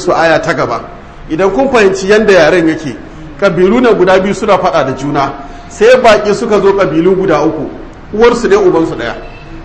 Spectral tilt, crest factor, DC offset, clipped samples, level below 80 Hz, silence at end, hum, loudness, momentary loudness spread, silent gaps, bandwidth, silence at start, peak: -5.5 dB/octave; 10 dB; 0.7%; 1%; -32 dBFS; 0 s; none; -9 LUFS; 17 LU; none; 11 kHz; 0 s; 0 dBFS